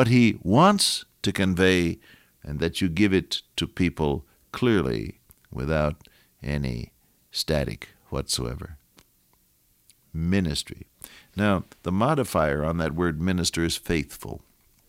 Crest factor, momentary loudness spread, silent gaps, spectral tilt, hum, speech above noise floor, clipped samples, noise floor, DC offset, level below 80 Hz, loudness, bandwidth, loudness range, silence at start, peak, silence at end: 20 dB; 19 LU; none; -5 dB/octave; none; 40 dB; under 0.1%; -64 dBFS; under 0.1%; -42 dBFS; -25 LUFS; 16.5 kHz; 8 LU; 0 s; -6 dBFS; 0.5 s